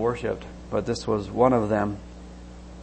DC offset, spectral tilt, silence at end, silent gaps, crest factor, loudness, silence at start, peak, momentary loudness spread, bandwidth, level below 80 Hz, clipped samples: under 0.1%; -7 dB/octave; 0 s; none; 20 dB; -25 LUFS; 0 s; -6 dBFS; 22 LU; 8.8 kHz; -44 dBFS; under 0.1%